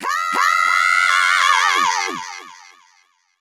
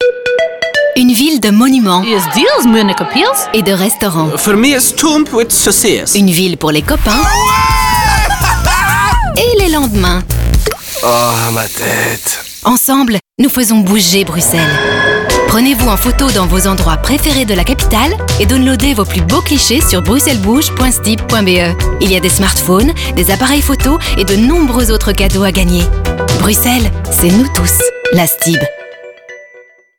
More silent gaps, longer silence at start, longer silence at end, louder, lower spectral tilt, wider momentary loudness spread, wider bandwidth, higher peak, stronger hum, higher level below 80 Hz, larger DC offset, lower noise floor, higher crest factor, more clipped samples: neither; about the same, 0 s vs 0 s; first, 0.85 s vs 0.4 s; second, -15 LUFS vs -10 LUFS; second, 1.5 dB/octave vs -4 dB/octave; first, 14 LU vs 4 LU; second, 17 kHz vs 19.5 kHz; about the same, 0 dBFS vs 0 dBFS; neither; second, -74 dBFS vs -18 dBFS; neither; first, -59 dBFS vs -40 dBFS; first, 18 dB vs 10 dB; neither